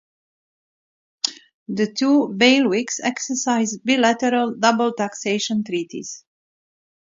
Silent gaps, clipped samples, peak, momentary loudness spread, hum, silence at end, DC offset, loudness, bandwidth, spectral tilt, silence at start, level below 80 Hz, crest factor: 1.54-1.66 s; under 0.1%; -2 dBFS; 11 LU; none; 0.95 s; under 0.1%; -20 LUFS; 7.8 kHz; -3 dB/octave; 1.25 s; -70 dBFS; 20 dB